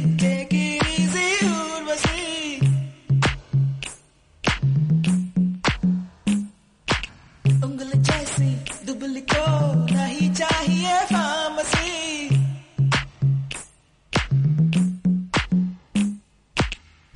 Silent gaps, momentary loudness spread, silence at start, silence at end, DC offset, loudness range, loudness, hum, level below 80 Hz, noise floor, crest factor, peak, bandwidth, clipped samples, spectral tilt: none; 7 LU; 0 s; 0.4 s; under 0.1%; 2 LU; -22 LUFS; none; -40 dBFS; -52 dBFS; 14 dB; -8 dBFS; 11 kHz; under 0.1%; -5 dB/octave